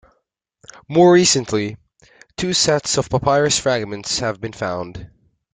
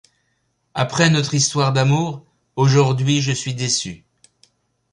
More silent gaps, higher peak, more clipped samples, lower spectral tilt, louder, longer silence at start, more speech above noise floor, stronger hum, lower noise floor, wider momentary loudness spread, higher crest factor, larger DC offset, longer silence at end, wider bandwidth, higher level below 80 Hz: neither; about the same, -2 dBFS vs -2 dBFS; neither; about the same, -3.5 dB/octave vs -4.5 dB/octave; about the same, -17 LUFS vs -18 LUFS; first, 0.9 s vs 0.75 s; about the same, 53 dB vs 51 dB; neither; about the same, -70 dBFS vs -68 dBFS; about the same, 16 LU vs 14 LU; about the same, 18 dB vs 18 dB; neither; second, 0.5 s vs 0.95 s; second, 9.6 kHz vs 11 kHz; first, -48 dBFS vs -54 dBFS